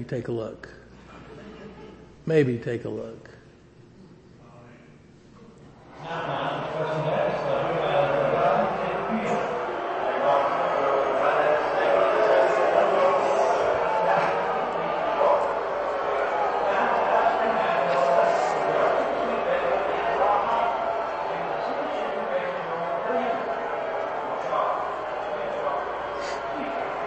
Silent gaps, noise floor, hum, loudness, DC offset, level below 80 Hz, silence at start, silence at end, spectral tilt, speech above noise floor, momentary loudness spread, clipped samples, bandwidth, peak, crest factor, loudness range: none; -51 dBFS; none; -24 LUFS; under 0.1%; -58 dBFS; 0 s; 0 s; -6 dB/octave; 24 dB; 9 LU; under 0.1%; 8.6 kHz; -8 dBFS; 18 dB; 9 LU